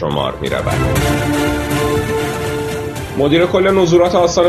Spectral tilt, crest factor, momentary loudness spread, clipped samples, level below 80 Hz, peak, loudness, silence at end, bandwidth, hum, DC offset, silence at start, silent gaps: -5.5 dB/octave; 14 dB; 9 LU; under 0.1%; -32 dBFS; 0 dBFS; -15 LUFS; 0 s; 14 kHz; none; under 0.1%; 0 s; none